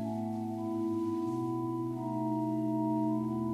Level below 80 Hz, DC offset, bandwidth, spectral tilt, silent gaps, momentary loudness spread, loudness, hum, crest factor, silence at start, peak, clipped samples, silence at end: -72 dBFS; under 0.1%; 13.5 kHz; -9.5 dB/octave; none; 4 LU; -34 LUFS; none; 10 dB; 0 s; -22 dBFS; under 0.1%; 0 s